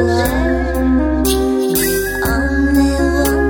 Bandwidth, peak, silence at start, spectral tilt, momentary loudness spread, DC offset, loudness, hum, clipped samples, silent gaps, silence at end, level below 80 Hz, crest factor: over 20 kHz; 0 dBFS; 0 s; -5 dB/octave; 3 LU; under 0.1%; -15 LUFS; none; under 0.1%; none; 0 s; -22 dBFS; 14 dB